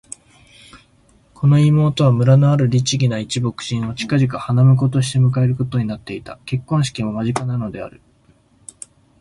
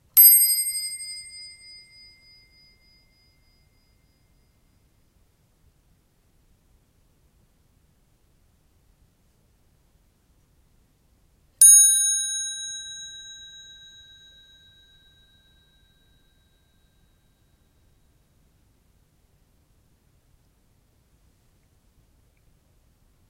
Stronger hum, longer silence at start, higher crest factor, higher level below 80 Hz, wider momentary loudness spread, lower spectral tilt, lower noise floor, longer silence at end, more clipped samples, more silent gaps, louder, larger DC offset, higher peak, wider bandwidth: neither; first, 0.75 s vs 0.15 s; second, 16 dB vs 26 dB; first, -48 dBFS vs -64 dBFS; second, 19 LU vs 31 LU; first, -6.5 dB/octave vs 3.5 dB/octave; second, -55 dBFS vs -63 dBFS; second, 1.3 s vs 10.2 s; neither; neither; about the same, -17 LUFS vs -15 LUFS; neither; about the same, -2 dBFS vs -2 dBFS; second, 11.5 kHz vs 16 kHz